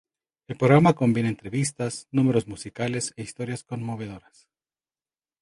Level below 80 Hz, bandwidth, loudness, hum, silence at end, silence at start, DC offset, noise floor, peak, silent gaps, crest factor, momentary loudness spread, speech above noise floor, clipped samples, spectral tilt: -58 dBFS; 11.5 kHz; -24 LUFS; none; 1.2 s; 0.5 s; under 0.1%; under -90 dBFS; -4 dBFS; none; 22 dB; 18 LU; over 66 dB; under 0.1%; -6 dB/octave